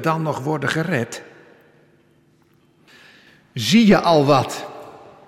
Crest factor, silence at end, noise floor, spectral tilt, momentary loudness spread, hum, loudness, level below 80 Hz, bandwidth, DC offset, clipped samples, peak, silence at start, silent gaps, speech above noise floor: 18 dB; 0.3 s; -57 dBFS; -5.5 dB/octave; 22 LU; none; -18 LUFS; -54 dBFS; 14.5 kHz; under 0.1%; under 0.1%; -4 dBFS; 0 s; none; 40 dB